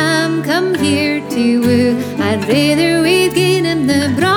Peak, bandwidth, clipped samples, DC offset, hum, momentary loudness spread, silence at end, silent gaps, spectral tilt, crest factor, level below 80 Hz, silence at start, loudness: -2 dBFS; 19 kHz; under 0.1%; under 0.1%; none; 4 LU; 0 s; none; -5 dB/octave; 12 dB; -48 dBFS; 0 s; -13 LUFS